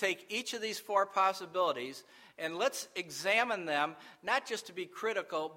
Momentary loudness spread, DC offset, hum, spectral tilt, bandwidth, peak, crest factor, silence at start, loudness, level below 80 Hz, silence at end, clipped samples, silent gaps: 10 LU; under 0.1%; none; -2 dB/octave; 16 kHz; -14 dBFS; 20 dB; 0 s; -34 LUFS; -86 dBFS; 0 s; under 0.1%; none